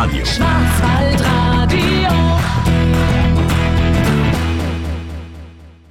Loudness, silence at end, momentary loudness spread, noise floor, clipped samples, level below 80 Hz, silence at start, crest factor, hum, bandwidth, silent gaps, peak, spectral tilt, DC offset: -15 LUFS; 0.2 s; 9 LU; -37 dBFS; under 0.1%; -22 dBFS; 0 s; 8 dB; none; 16 kHz; none; -6 dBFS; -6 dB/octave; 0.6%